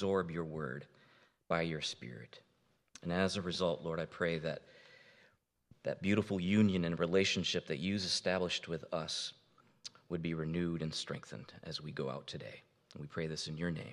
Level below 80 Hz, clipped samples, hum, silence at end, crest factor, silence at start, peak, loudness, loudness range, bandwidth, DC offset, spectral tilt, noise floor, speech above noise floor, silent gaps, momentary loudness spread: -66 dBFS; under 0.1%; none; 0 s; 20 dB; 0 s; -16 dBFS; -37 LUFS; 8 LU; 11.5 kHz; under 0.1%; -5 dB/octave; -71 dBFS; 34 dB; none; 17 LU